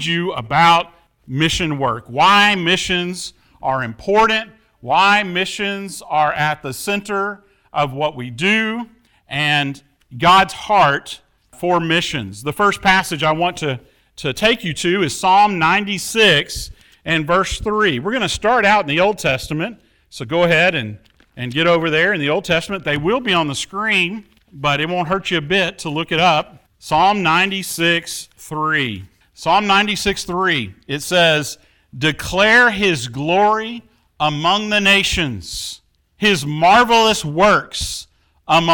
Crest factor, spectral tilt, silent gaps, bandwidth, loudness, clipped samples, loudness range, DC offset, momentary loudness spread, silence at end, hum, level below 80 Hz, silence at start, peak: 16 dB; -4 dB/octave; none; 18 kHz; -16 LUFS; under 0.1%; 3 LU; under 0.1%; 14 LU; 0 s; none; -44 dBFS; 0 s; -2 dBFS